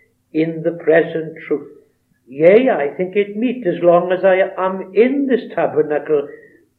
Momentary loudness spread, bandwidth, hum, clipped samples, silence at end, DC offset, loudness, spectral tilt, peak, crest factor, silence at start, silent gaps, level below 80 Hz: 11 LU; 4.3 kHz; none; under 0.1%; 0.45 s; under 0.1%; -16 LUFS; -9.5 dB/octave; 0 dBFS; 16 dB; 0.35 s; none; -74 dBFS